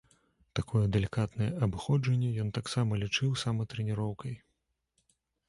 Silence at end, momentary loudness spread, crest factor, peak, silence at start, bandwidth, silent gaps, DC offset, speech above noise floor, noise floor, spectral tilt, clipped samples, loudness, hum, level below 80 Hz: 1.1 s; 9 LU; 18 dB; -14 dBFS; 0.55 s; 11.5 kHz; none; under 0.1%; 50 dB; -80 dBFS; -6 dB/octave; under 0.1%; -32 LUFS; none; -52 dBFS